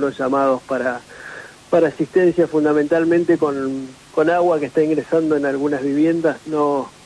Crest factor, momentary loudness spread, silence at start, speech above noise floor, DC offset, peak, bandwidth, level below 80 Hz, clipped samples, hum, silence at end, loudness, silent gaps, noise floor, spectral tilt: 12 dB; 9 LU; 0 s; 19 dB; under 0.1%; -6 dBFS; 11 kHz; -58 dBFS; under 0.1%; none; 0.15 s; -18 LUFS; none; -37 dBFS; -7 dB/octave